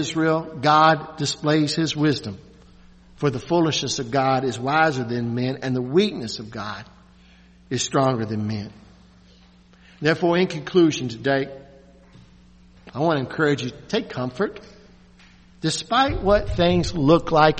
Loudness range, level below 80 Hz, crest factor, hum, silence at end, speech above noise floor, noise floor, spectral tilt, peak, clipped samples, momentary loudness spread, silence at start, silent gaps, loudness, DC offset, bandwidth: 5 LU; -44 dBFS; 22 dB; none; 0 s; 31 dB; -52 dBFS; -5 dB/octave; 0 dBFS; under 0.1%; 12 LU; 0 s; none; -22 LUFS; under 0.1%; 8.4 kHz